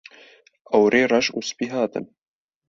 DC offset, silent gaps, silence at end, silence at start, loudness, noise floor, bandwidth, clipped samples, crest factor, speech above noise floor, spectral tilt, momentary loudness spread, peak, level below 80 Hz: under 0.1%; none; 0.65 s; 0.7 s; -21 LUFS; -52 dBFS; 7.6 kHz; under 0.1%; 20 dB; 32 dB; -4 dB/octave; 10 LU; -4 dBFS; -64 dBFS